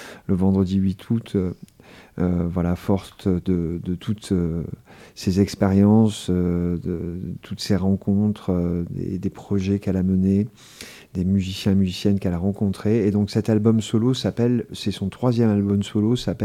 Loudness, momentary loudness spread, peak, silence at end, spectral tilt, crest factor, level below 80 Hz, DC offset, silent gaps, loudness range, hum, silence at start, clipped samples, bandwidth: -22 LUFS; 10 LU; -6 dBFS; 0 s; -7.5 dB/octave; 16 dB; -50 dBFS; under 0.1%; none; 4 LU; none; 0 s; under 0.1%; 14 kHz